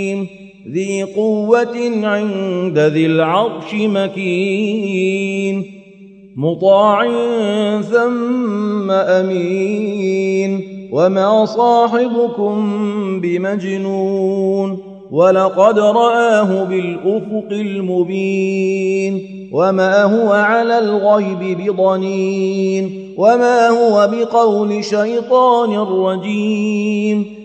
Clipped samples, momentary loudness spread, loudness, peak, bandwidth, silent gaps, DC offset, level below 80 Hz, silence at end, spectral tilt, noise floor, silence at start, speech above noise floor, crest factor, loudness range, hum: under 0.1%; 8 LU; -15 LUFS; 0 dBFS; 8.8 kHz; none; under 0.1%; -64 dBFS; 0 s; -6.5 dB/octave; -40 dBFS; 0 s; 25 dB; 14 dB; 3 LU; none